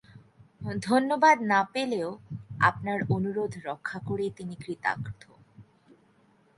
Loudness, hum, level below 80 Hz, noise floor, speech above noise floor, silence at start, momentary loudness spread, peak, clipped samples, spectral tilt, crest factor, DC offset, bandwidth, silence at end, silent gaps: -27 LUFS; none; -60 dBFS; -63 dBFS; 36 dB; 0.15 s; 18 LU; -8 dBFS; under 0.1%; -6 dB/octave; 22 dB; under 0.1%; 11.5 kHz; 0.95 s; none